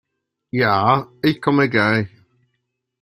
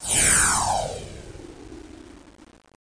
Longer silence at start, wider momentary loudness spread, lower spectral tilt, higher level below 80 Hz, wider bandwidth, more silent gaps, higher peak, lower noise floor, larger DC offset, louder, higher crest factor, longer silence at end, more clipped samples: first, 0.55 s vs 0 s; second, 7 LU vs 27 LU; first, -7.5 dB/octave vs -1 dB/octave; second, -58 dBFS vs -42 dBFS; first, 15.5 kHz vs 10.5 kHz; neither; first, -2 dBFS vs -6 dBFS; first, -76 dBFS vs -51 dBFS; neither; about the same, -18 LUFS vs -19 LUFS; about the same, 18 dB vs 20 dB; about the same, 0.95 s vs 0.9 s; neither